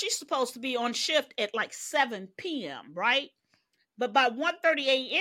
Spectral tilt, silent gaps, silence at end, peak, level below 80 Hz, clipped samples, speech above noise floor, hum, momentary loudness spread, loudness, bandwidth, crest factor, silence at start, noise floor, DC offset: -1.5 dB/octave; none; 0 s; -10 dBFS; -82 dBFS; under 0.1%; 43 dB; none; 10 LU; -28 LUFS; 16.5 kHz; 18 dB; 0 s; -72 dBFS; under 0.1%